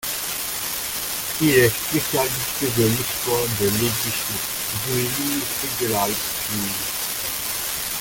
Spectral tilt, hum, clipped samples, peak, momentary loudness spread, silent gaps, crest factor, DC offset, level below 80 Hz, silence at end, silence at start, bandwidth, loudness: -3 dB/octave; none; under 0.1%; -4 dBFS; 6 LU; none; 20 dB; under 0.1%; -48 dBFS; 0 s; 0 s; 17 kHz; -21 LUFS